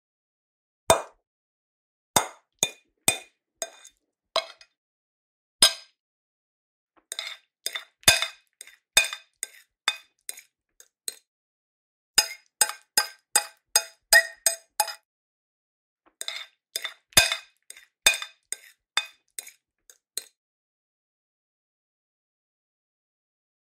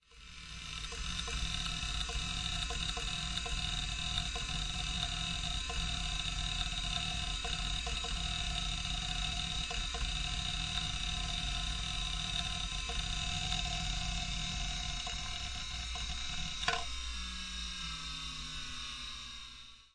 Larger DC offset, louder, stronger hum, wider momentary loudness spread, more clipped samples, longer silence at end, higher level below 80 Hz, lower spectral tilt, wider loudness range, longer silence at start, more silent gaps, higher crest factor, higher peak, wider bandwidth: neither; first, -24 LUFS vs -37 LUFS; neither; first, 18 LU vs 6 LU; neither; first, 3.55 s vs 0.05 s; second, -60 dBFS vs -42 dBFS; second, 0.5 dB/octave vs -2 dB/octave; first, 12 LU vs 3 LU; first, 0.9 s vs 0.1 s; first, 1.27-2.14 s, 4.77-5.59 s, 6.00-6.87 s, 11.27-12.14 s, 15.05-15.96 s vs none; first, 30 dB vs 22 dB; first, 0 dBFS vs -14 dBFS; first, 16 kHz vs 11.5 kHz